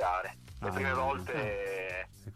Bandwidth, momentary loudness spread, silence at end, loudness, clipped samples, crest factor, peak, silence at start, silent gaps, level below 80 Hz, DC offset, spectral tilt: 15.5 kHz; 9 LU; 0 s; -35 LUFS; under 0.1%; 16 dB; -20 dBFS; 0 s; none; -54 dBFS; under 0.1%; -5.5 dB/octave